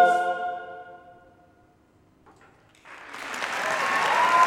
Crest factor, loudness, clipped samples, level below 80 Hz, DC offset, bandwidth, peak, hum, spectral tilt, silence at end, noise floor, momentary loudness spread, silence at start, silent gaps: 20 dB; -25 LUFS; under 0.1%; -70 dBFS; under 0.1%; 16 kHz; -8 dBFS; none; -2 dB/octave; 0 s; -60 dBFS; 23 LU; 0 s; none